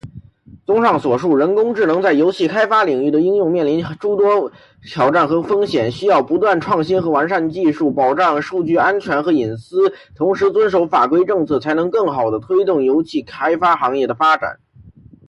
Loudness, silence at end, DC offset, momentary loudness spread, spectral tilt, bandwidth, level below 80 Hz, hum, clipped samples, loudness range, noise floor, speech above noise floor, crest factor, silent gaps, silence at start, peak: -16 LUFS; 0.4 s; under 0.1%; 5 LU; -7 dB/octave; 10.5 kHz; -54 dBFS; none; under 0.1%; 1 LU; -44 dBFS; 29 dB; 12 dB; none; 0.05 s; -4 dBFS